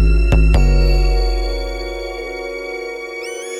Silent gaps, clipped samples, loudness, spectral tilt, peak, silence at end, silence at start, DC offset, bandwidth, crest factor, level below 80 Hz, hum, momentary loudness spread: none; under 0.1%; -19 LUFS; -6 dB/octave; -4 dBFS; 0 s; 0 s; under 0.1%; 10.5 kHz; 12 dB; -16 dBFS; none; 12 LU